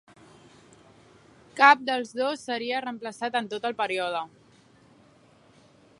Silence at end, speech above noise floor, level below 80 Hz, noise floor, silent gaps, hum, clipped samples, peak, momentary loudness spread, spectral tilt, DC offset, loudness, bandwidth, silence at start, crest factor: 1.75 s; 32 dB; -74 dBFS; -58 dBFS; none; none; under 0.1%; -2 dBFS; 16 LU; -3 dB/octave; under 0.1%; -25 LUFS; 11.5 kHz; 1.55 s; 26 dB